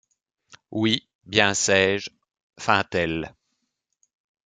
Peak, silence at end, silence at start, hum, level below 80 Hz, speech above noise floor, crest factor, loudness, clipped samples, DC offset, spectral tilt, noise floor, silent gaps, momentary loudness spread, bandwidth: -2 dBFS; 1.15 s; 0.7 s; none; -58 dBFS; 55 dB; 24 dB; -22 LUFS; under 0.1%; under 0.1%; -3 dB/octave; -78 dBFS; 1.15-1.19 s, 2.43-2.50 s; 14 LU; 9.6 kHz